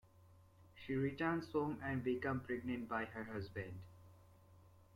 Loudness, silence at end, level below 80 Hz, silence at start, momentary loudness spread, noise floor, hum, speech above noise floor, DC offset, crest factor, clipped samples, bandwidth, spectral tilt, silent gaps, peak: -42 LUFS; 0.1 s; -70 dBFS; 0.05 s; 12 LU; -66 dBFS; none; 24 dB; under 0.1%; 18 dB; under 0.1%; 16 kHz; -8 dB/octave; none; -26 dBFS